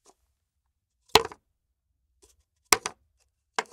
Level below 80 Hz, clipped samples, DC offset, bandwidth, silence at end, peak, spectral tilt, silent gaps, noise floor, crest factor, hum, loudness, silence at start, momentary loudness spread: -60 dBFS; under 0.1%; under 0.1%; 16 kHz; 0.1 s; 0 dBFS; -1 dB/octave; none; -80 dBFS; 32 dB; none; -25 LUFS; 1.15 s; 15 LU